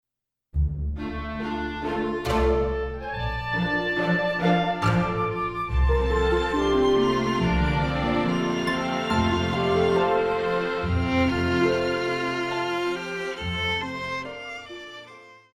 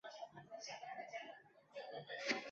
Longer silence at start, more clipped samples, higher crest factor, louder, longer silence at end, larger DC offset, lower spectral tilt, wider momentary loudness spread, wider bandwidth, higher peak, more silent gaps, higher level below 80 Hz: first, 0.55 s vs 0.05 s; neither; second, 16 dB vs 26 dB; first, -25 LUFS vs -49 LUFS; first, 0.15 s vs 0 s; neither; first, -6.5 dB/octave vs -1 dB/octave; second, 9 LU vs 14 LU; first, 13 kHz vs 7.6 kHz; first, -10 dBFS vs -24 dBFS; neither; first, -34 dBFS vs -90 dBFS